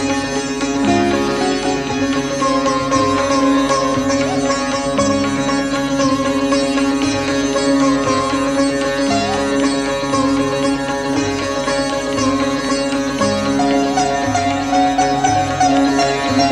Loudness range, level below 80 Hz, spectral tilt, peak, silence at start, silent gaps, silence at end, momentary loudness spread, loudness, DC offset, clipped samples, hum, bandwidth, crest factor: 2 LU; -40 dBFS; -4 dB/octave; -2 dBFS; 0 s; none; 0 s; 4 LU; -16 LUFS; under 0.1%; under 0.1%; none; 12 kHz; 14 dB